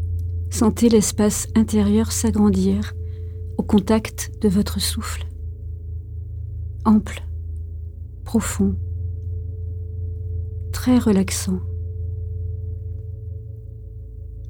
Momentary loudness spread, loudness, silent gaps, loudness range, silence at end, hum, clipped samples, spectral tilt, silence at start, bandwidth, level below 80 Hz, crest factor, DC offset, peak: 16 LU; -22 LUFS; none; 7 LU; 0 s; none; under 0.1%; -5.5 dB/octave; 0 s; 18 kHz; -34 dBFS; 18 dB; under 0.1%; -4 dBFS